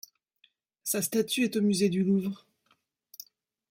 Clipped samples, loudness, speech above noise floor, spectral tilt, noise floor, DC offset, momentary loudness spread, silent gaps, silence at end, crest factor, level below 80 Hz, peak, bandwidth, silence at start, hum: under 0.1%; -28 LUFS; 45 dB; -4.5 dB/octave; -72 dBFS; under 0.1%; 22 LU; none; 1.35 s; 16 dB; -74 dBFS; -14 dBFS; 16.5 kHz; 0.85 s; none